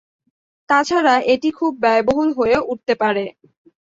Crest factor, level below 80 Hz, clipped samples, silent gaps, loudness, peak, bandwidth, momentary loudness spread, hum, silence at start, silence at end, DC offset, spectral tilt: 16 dB; -52 dBFS; under 0.1%; none; -17 LUFS; -2 dBFS; 8 kHz; 6 LU; none; 0.7 s; 0.55 s; under 0.1%; -4.5 dB/octave